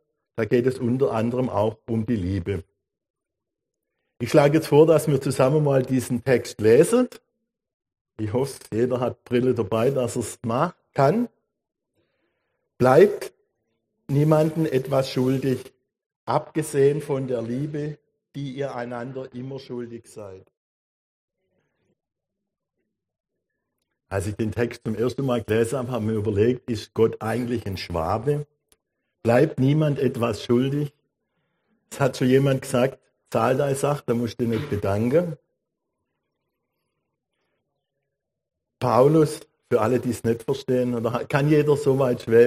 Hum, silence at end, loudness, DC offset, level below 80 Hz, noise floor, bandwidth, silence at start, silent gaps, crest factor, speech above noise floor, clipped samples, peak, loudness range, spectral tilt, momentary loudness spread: none; 0 s; -23 LUFS; under 0.1%; -58 dBFS; -85 dBFS; 15 kHz; 0.35 s; 3.10-3.14 s, 7.74-7.80 s, 8.01-8.05 s, 16.06-16.10 s, 16.16-16.27 s, 20.57-21.28 s, 23.20-23.24 s; 20 dB; 63 dB; under 0.1%; -4 dBFS; 10 LU; -7 dB/octave; 14 LU